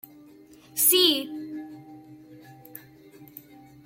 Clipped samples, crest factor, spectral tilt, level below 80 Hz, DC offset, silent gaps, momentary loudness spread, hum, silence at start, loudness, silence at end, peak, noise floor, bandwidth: under 0.1%; 24 dB; -1 dB/octave; -72 dBFS; under 0.1%; none; 28 LU; none; 0.75 s; -21 LUFS; 0.6 s; -6 dBFS; -52 dBFS; 16.5 kHz